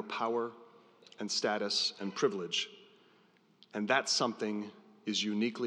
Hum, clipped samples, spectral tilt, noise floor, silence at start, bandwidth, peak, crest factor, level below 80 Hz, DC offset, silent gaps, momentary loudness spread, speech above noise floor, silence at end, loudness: none; under 0.1%; -3 dB/octave; -67 dBFS; 0 s; 11 kHz; -14 dBFS; 22 dB; under -90 dBFS; under 0.1%; none; 12 LU; 33 dB; 0 s; -34 LUFS